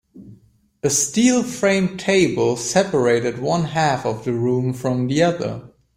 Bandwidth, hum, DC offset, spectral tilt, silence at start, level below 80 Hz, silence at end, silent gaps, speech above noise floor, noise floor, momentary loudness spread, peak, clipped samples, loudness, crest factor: 16 kHz; none; under 0.1%; -4.5 dB/octave; 0.15 s; -54 dBFS; 0.3 s; none; 34 dB; -53 dBFS; 6 LU; -2 dBFS; under 0.1%; -19 LUFS; 16 dB